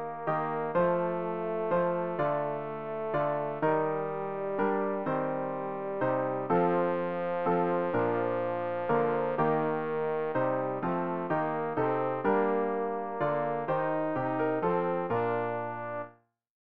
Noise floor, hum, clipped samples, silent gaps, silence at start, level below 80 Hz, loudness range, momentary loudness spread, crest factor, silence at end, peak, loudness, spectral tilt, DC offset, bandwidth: -57 dBFS; none; under 0.1%; none; 0 s; -66 dBFS; 2 LU; 6 LU; 16 dB; 0.1 s; -14 dBFS; -30 LUFS; -6.5 dB/octave; 0.3%; 4.7 kHz